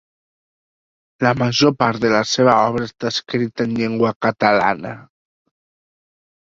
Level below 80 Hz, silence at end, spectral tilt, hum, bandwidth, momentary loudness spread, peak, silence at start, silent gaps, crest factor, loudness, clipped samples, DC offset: -54 dBFS; 1.55 s; -5 dB/octave; none; 7.8 kHz; 9 LU; -2 dBFS; 1.2 s; 4.16-4.20 s; 18 dB; -17 LUFS; under 0.1%; under 0.1%